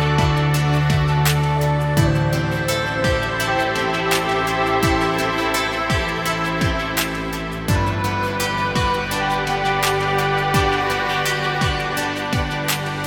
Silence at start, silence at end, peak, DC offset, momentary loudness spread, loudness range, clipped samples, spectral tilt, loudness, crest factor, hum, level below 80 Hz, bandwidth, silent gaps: 0 s; 0 s; -4 dBFS; under 0.1%; 4 LU; 2 LU; under 0.1%; -5 dB/octave; -19 LUFS; 16 dB; none; -34 dBFS; 19 kHz; none